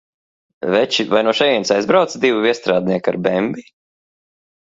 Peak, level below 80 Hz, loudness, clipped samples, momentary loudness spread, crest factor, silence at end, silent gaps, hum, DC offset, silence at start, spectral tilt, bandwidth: 0 dBFS; -60 dBFS; -16 LUFS; under 0.1%; 6 LU; 18 dB; 1.1 s; none; none; under 0.1%; 0.6 s; -4.5 dB/octave; 7.8 kHz